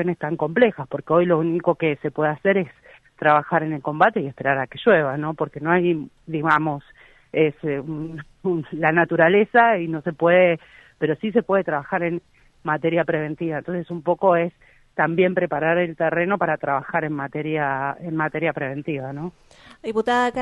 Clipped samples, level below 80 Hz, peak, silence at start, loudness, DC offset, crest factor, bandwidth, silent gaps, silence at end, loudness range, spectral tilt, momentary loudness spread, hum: under 0.1%; -60 dBFS; -4 dBFS; 0 s; -21 LUFS; under 0.1%; 18 dB; 8.4 kHz; none; 0 s; 5 LU; -8 dB/octave; 11 LU; none